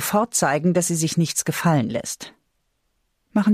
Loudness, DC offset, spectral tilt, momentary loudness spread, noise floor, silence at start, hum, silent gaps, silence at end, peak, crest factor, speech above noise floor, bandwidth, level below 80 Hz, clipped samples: -21 LUFS; under 0.1%; -4.5 dB/octave; 11 LU; -71 dBFS; 0 s; none; none; 0 s; -8 dBFS; 14 dB; 50 dB; 15.5 kHz; -60 dBFS; under 0.1%